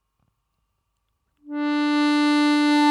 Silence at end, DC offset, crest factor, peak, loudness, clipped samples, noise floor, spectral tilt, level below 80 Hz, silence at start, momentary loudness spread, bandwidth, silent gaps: 0 s; under 0.1%; 16 dB; -6 dBFS; -20 LUFS; under 0.1%; -74 dBFS; -2 dB/octave; -76 dBFS; 1.45 s; 9 LU; 11 kHz; none